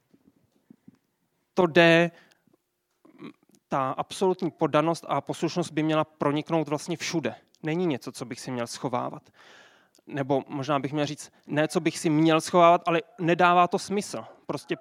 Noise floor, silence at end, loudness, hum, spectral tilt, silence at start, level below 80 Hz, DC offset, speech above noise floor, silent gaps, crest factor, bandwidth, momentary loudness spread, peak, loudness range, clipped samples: -74 dBFS; 0.05 s; -25 LUFS; none; -5.5 dB/octave; 1.55 s; -76 dBFS; under 0.1%; 49 dB; none; 24 dB; 14.5 kHz; 15 LU; -4 dBFS; 8 LU; under 0.1%